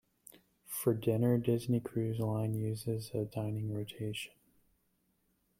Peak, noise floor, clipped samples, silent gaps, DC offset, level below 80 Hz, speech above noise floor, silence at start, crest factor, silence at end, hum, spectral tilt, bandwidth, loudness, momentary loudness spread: -18 dBFS; -77 dBFS; under 0.1%; none; under 0.1%; -66 dBFS; 43 dB; 0.7 s; 18 dB; 1.35 s; none; -7 dB/octave; 16.5 kHz; -35 LUFS; 10 LU